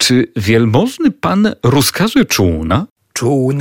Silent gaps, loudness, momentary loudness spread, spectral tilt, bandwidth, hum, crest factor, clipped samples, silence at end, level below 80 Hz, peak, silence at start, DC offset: 2.91-2.96 s; -13 LUFS; 5 LU; -5 dB/octave; 17 kHz; none; 10 dB; under 0.1%; 0 s; -36 dBFS; -2 dBFS; 0 s; under 0.1%